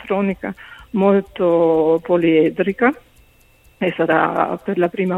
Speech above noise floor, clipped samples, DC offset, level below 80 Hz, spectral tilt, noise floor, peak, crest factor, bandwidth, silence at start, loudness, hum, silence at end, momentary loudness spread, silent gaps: 35 dB; under 0.1%; under 0.1%; -52 dBFS; -8.5 dB/octave; -52 dBFS; 0 dBFS; 16 dB; 4.1 kHz; 0 s; -17 LUFS; none; 0 s; 11 LU; none